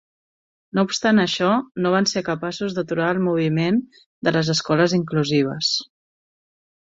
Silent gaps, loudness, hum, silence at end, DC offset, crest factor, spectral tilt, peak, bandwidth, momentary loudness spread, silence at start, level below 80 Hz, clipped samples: 4.06-4.22 s; -21 LUFS; none; 1 s; under 0.1%; 18 dB; -5 dB/octave; -4 dBFS; 7.8 kHz; 7 LU; 0.75 s; -60 dBFS; under 0.1%